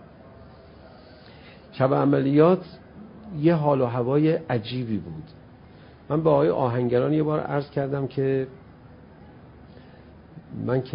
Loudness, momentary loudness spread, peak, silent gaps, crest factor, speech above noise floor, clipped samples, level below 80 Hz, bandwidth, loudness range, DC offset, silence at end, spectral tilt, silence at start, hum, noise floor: -23 LUFS; 19 LU; -6 dBFS; none; 20 dB; 25 dB; under 0.1%; -56 dBFS; 5.4 kHz; 6 LU; under 0.1%; 0 s; -12.5 dB/octave; 0.25 s; none; -48 dBFS